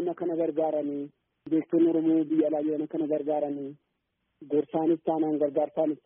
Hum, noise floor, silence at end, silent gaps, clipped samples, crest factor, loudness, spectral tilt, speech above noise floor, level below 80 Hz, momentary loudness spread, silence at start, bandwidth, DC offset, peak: none; -79 dBFS; 0.1 s; none; under 0.1%; 14 dB; -28 LUFS; -6 dB/octave; 52 dB; -76 dBFS; 9 LU; 0 s; 3.6 kHz; under 0.1%; -14 dBFS